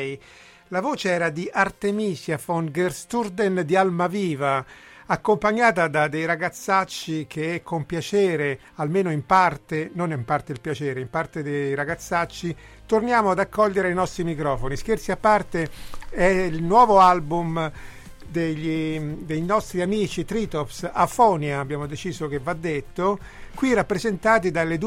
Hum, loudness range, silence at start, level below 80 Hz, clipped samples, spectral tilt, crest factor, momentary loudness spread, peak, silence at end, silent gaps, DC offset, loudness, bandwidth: none; 5 LU; 0 s; -44 dBFS; under 0.1%; -6 dB/octave; 18 dB; 10 LU; -4 dBFS; 0 s; none; under 0.1%; -23 LUFS; 16 kHz